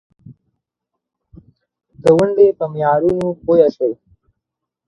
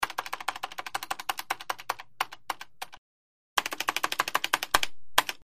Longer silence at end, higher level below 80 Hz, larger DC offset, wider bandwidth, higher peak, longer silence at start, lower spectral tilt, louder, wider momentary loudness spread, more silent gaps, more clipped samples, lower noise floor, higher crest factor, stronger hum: first, 0.95 s vs 0 s; first, -52 dBFS vs -60 dBFS; neither; second, 11 kHz vs 15.5 kHz; about the same, 0 dBFS vs -2 dBFS; first, 0.3 s vs 0 s; first, -8 dB/octave vs 0 dB/octave; first, -15 LUFS vs -31 LUFS; about the same, 9 LU vs 11 LU; second, none vs 2.98-3.56 s; neither; second, -80 dBFS vs under -90 dBFS; second, 18 dB vs 30 dB; neither